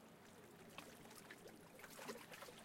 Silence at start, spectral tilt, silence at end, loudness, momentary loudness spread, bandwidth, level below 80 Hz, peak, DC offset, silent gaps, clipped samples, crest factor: 0 s; -3 dB/octave; 0 s; -58 LUFS; 9 LU; 16.5 kHz; -84 dBFS; -36 dBFS; under 0.1%; none; under 0.1%; 22 dB